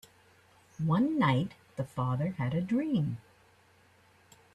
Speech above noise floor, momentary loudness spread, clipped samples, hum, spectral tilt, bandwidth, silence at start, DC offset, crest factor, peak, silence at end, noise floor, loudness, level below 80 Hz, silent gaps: 34 dB; 11 LU; under 0.1%; none; -8 dB/octave; 12.5 kHz; 0.8 s; under 0.1%; 18 dB; -14 dBFS; 1.4 s; -63 dBFS; -31 LUFS; -66 dBFS; none